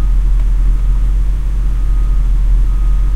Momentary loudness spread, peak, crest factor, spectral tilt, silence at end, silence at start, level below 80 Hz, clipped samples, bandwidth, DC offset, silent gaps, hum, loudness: 3 LU; -2 dBFS; 8 dB; -7.5 dB/octave; 0 s; 0 s; -10 dBFS; under 0.1%; 2.8 kHz; under 0.1%; none; none; -17 LUFS